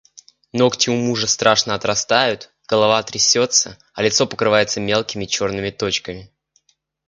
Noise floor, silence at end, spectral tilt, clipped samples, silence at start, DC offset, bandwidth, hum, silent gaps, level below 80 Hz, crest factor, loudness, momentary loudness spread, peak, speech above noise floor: -62 dBFS; 0.85 s; -2.5 dB/octave; under 0.1%; 0.55 s; under 0.1%; 10.5 kHz; none; none; -52 dBFS; 20 dB; -17 LUFS; 8 LU; 0 dBFS; 44 dB